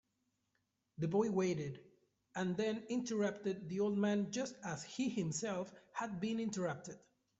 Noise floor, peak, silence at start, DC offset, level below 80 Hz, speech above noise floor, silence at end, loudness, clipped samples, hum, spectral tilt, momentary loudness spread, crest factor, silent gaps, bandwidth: -84 dBFS; -22 dBFS; 1 s; under 0.1%; -76 dBFS; 45 dB; 0.45 s; -39 LUFS; under 0.1%; none; -5.5 dB/octave; 12 LU; 18 dB; none; 8.2 kHz